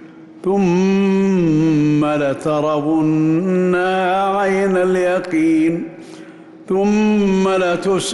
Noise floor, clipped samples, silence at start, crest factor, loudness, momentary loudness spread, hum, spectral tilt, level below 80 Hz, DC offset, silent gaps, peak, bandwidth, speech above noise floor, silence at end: -38 dBFS; under 0.1%; 0 s; 8 dB; -16 LUFS; 4 LU; none; -6.5 dB/octave; -50 dBFS; under 0.1%; none; -8 dBFS; 12 kHz; 22 dB; 0 s